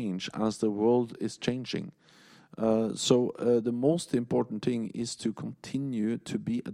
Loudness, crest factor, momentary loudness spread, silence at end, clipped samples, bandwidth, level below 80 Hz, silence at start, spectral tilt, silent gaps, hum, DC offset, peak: -30 LUFS; 20 dB; 9 LU; 0 s; under 0.1%; 13 kHz; -66 dBFS; 0 s; -5.5 dB/octave; none; none; under 0.1%; -10 dBFS